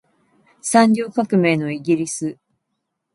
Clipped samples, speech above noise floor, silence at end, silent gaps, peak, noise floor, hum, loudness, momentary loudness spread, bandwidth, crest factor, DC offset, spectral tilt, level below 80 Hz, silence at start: under 0.1%; 58 dB; 0.8 s; none; 0 dBFS; -76 dBFS; none; -19 LUFS; 12 LU; 11.5 kHz; 20 dB; under 0.1%; -5 dB/octave; -66 dBFS; 0.65 s